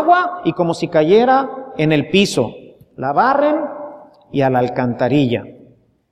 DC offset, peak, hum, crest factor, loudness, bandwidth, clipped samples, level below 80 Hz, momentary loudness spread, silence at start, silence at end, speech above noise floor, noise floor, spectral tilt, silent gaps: under 0.1%; 0 dBFS; none; 16 dB; -16 LUFS; 14.5 kHz; under 0.1%; -54 dBFS; 12 LU; 0 s; 0.6 s; 34 dB; -49 dBFS; -6 dB/octave; none